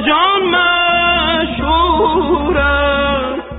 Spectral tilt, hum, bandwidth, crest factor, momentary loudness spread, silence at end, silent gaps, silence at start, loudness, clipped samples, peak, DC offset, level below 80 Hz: -2 dB/octave; none; 4 kHz; 12 dB; 4 LU; 0 s; none; 0 s; -13 LUFS; under 0.1%; -2 dBFS; under 0.1%; -28 dBFS